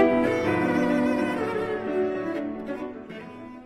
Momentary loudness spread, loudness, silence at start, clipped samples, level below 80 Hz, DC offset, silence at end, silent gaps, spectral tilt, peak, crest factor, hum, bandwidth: 16 LU; -26 LUFS; 0 s; under 0.1%; -56 dBFS; under 0.1%; 0 s; none; -7 dB/octave; -8 dBFS; 18 dB; none; 13 kHz